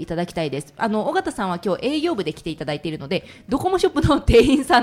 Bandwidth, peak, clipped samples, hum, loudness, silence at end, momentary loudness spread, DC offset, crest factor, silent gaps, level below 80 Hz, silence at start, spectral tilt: 15.5 kHz; -4 dBFS; under 0.1%; none; -21 LUFS; 0 s; 12 LU; under 0.1%; 16 dB; none; -36 dBFS; 0 s; -5.5 dB/octave